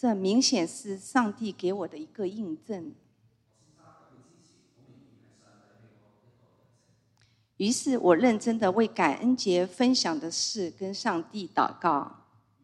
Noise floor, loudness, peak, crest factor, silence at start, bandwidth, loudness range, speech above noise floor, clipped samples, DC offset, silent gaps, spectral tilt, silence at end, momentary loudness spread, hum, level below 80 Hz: -67 dBFS; -27 LUFS; -8 dBFS; 20 dB; 0.05 s; 12 kHz; 15 LU; 40 dB; under 0.1%; under 0.1%; none; -4 dB/octave; 0.55 s; 13 LU; none; -76 dBFS